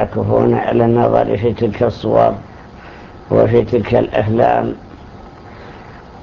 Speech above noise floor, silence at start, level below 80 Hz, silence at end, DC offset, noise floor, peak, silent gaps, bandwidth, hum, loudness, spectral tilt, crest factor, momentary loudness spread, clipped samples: 22 dB; 0 s; -38 dBFS; 0 s; under 0.1%; -36 dBFS; 0 dBFS; none; 6.8 kHz; none; -14 LUFS; -9.5 dB/octave; 16 dB; 23 LU; under 0.1%